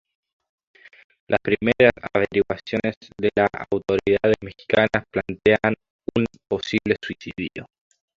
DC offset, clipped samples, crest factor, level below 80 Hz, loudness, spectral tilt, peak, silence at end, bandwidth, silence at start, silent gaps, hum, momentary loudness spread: under 0.1%; under 0.1%; 20 dB; -50 dBFS; -22 LUFS; -6.5 dB/octave; -2 dBFS; 0.55 s; 7.4 kHz; 1.3 s; 2.97-3.01 s, 5.90-5.99 s; none; 12 LU